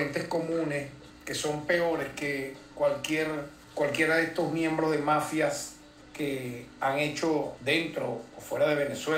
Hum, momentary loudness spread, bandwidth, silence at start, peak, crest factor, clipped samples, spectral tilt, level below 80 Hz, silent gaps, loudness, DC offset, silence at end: none; 11 LU; 16 kHz; 0 s; -12 dBFS; 18 dB; under 0.1%; -4.5 dB/octave; -62 dBFS; none; -29 LUFS; under 0.1%; 0 s